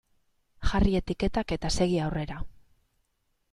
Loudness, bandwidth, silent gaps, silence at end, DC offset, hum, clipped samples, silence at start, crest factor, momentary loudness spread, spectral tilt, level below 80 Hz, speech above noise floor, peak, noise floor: -29 LUFS; 12 kHz; none; 1 s; under 0.1%; none; under 0.1%; 0.6 s; 18 dB; 12 LU; -6 dB/octave; -36 dBFS; 48 dB; -12 dBFS; -75 dBFS